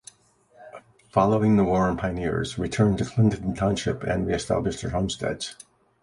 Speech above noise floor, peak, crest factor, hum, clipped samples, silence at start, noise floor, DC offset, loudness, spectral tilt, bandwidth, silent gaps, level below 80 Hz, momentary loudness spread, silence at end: 36 dB; -4 dBFS; 20 dB; none; under 0.1%; 0.6 s; -60 dBFS; under 0.1%; -24 LUFS; -6.5 dB/octave; 11.5 kHz; none; -44 dBFS; 8 LU; 0.5 s